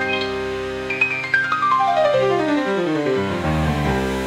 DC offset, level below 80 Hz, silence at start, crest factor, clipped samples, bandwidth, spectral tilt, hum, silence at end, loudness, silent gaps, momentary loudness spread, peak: under 0.1%; -38 dBFS; 0 s; 16 dB; under 0.1%; 15.5 kHz; -6 dB/octave; none; 0 s; -19 LUFS; none; 7 LU; -4 dBFS